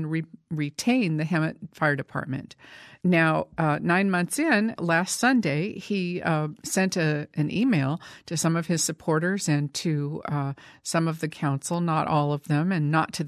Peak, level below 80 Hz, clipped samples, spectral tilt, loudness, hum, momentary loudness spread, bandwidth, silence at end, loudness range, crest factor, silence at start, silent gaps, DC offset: -8 dBFS; -64 dBFS; under 0.1%; -5 dB/octave; -25 LUFS; none; 9 LU; 14 kHz; 0 s; 3 LU; 16 dB; 0 s; none; under 0.1%